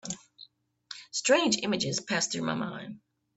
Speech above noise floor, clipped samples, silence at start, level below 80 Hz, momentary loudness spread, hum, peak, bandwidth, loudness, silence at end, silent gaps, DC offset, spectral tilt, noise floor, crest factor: 28 dB; under 0.1%; 0.05 s; -70 dBFS; 20 LU; none; -10 dBFS; 8.4 kHz; -28 LUFS; 0.4 s; none; under 0.1%; -3 dB/octave; -57 dBFS; 22 dB